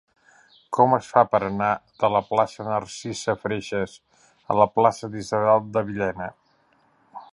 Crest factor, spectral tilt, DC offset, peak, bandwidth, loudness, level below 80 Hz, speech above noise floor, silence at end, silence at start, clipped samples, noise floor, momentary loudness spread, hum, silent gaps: 22 dB; -5.5 dB/octave; under 0.1%; -2 dBFS; 11.5 kHz; -23 LUFS; -58 dBFS; 40 dB; 0.1 s; 0.7 s; under 0.1%; -63 dBFS; 10 LU; none; none